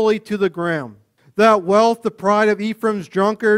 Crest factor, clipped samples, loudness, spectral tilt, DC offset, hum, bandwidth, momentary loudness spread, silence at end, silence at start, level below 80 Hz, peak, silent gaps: 16 dB; under 0.1%; -17 LUFS; -5.5 dB/octave; under 0.1%; none; 15 kHz; 9 LU; 0 s; 0 s; -62 dBFS; 0 dBFS; none